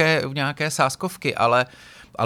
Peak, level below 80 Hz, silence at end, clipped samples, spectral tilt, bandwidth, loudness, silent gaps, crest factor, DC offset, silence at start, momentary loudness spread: -4 dBFS; -60 dBFS; 0 s; under 0.1%; -4 dB/octave; 18 kHz; -22 LUFS; none; 18 dB; under 0.1%; 0 s; 8 LU